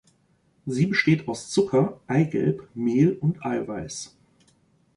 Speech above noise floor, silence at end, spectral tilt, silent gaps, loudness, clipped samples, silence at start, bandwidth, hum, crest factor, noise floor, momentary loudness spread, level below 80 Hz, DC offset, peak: 41 dB; 0.9 s; -6.5 dB/octave; none; -24 LUFS; under 0.1%; 0.65 s; 11 kHz; none; 18 dB; -64 dBFS; 12 LU; -60 dBFS; under 0.1%; -8 dBFS